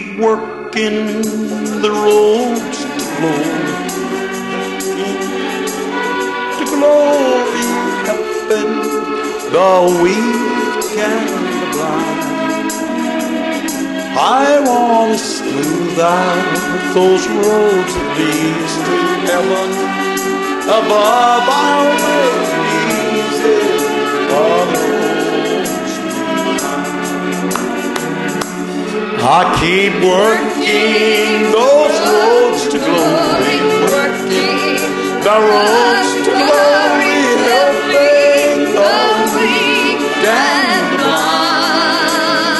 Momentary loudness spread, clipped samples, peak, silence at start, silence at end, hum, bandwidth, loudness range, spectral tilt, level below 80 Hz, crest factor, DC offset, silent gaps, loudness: 8 LU; under 0.1%; 0 dBFS; 0 s; 0 s; none; 12.5 kHz; 6 LU; -3.5 dB/octave; -48 dBFS; 14 dB; under 0.1%; none; -13 LUFS